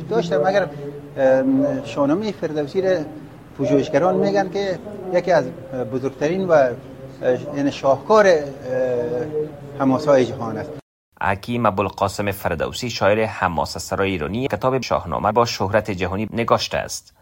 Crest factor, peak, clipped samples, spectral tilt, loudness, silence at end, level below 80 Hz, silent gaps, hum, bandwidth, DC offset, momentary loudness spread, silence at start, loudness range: 18 dB; -2 dBFS; under 0.1%; -5.5 dB/octave; -20 LUFS; 0.2 s; -48 dBFS; 10.82-11.12 s; none; 16.5 kHz; under 0.1%; 11 LU; 0 s; 3 LU